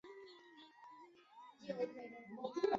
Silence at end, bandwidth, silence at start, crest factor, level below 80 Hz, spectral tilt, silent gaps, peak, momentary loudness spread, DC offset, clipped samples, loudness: 0 s; 7.6 kHz; 0.05 s; 24 dB; -82 dBFS; -3.5 dB/octave; none; -22 dBFS; 17 LU; under 0.1%; under 0.1%; -47 LUFS